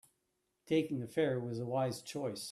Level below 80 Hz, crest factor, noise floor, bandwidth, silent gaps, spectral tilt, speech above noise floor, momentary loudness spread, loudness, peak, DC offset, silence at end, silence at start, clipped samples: -76 dBFS; 16 dB; -82 dBFS; 14 kHz; none; -6 dB/octave; 47 dB; 6 LU; -36 LUFS; -20 dBFS; under 0.1%; 0 s; 0.65 s; under 0.1%